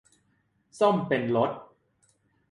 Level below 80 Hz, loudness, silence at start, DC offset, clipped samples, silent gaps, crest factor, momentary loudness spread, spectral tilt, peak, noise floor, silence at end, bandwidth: -70 dBFS; -26 LUFS; 0.75 s; under 0.1%; under 0.1%; none; 20 dB; 6 LU; -7 dB/octave; -8 dBFS; -70 dBFS; 0.9 s; 11.5 kHz